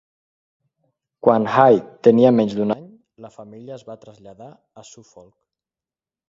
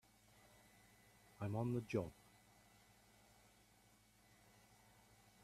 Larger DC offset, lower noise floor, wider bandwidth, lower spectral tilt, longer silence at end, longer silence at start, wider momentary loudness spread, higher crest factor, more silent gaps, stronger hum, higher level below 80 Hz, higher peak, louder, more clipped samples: neither; first, under -90 dBFS vs -72 dBFS; second, 7.6 kHz vs 14.5 kHz; about the same, -7.5 dB/octave vs -7.5 dB/octave; second, 1.8 s vs 3.3 s; second, 1.25 s vs 1.4 s; about the same, 24 LU vs 26 LU; about the same, 20 dB vs 24 dB; neither; second, none vs 50 Hz at -70 dBFS; first, -64 dBFS vs -76 dBFS; first, 0 dBFS vs -26 dBFS; first, -16 LUFS vs -45 LUFS; neither